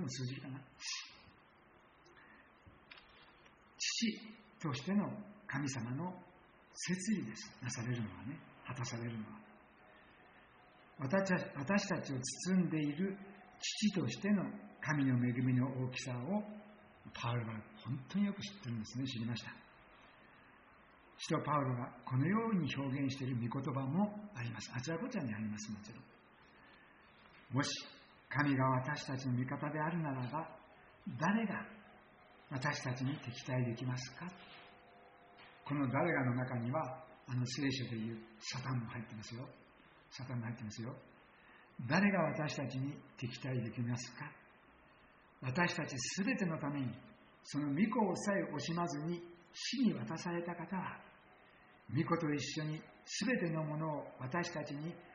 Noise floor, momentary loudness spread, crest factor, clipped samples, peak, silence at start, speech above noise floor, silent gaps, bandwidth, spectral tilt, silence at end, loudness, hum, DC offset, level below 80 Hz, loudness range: -65 dBFS; 16 LU; 22 dB; under 0.1%; -18 dBFS; 0 s; 27 dB; none; 7.4 kHz; -5 dB/octave; 0 s; -39 LUFS; none; under 0.1%; -74 dBFS; 7 LU